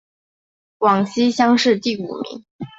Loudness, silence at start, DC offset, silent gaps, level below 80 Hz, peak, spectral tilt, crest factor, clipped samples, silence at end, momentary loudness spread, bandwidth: -18 LUFS; 0.8 s; under 0.1%; 2.51-2.59 s; -62 dBFS; -2 dBFS; -5 dB/octave; 16 dB; under 0.1%; 0.1 s; 15 LU; 8 kHz